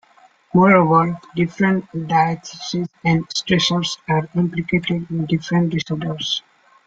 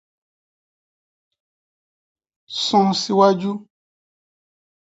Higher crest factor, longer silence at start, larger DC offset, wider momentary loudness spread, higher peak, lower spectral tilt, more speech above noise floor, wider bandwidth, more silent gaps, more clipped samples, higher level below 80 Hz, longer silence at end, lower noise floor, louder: about the same, 18 dB vs 22 dB; second, 0.55 s vs 2.5 s; neither; second, 10 LU vs 13 LU; about the same, -2 dBFS vs -2 dBFS; about the same, -5.5 dB/octave vs -5 dB/octave; second, 34 dB vs over 72 dB; about the same, 7.8 kHz vs 8 kHz; neither; neither; first, -54 dBFS vs -70 dBFS; second, 0.45 s vs 1.3 s; second, -53 dBFS vs under -90 dBFS; about the same, -19 LUFS vs -18 LUFS